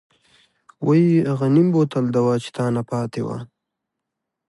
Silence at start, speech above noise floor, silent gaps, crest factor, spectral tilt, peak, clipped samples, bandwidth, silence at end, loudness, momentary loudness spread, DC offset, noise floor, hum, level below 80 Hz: 0.8 s; 63 dB; none; 16 dB; -8.5 dB/octave; -6 dBFS; under 0.1%; 11.5 kHz; 1.05 s; -20 LUFS; 11 LU; under 0.1%; -82 dBFS; none; -62 dBFS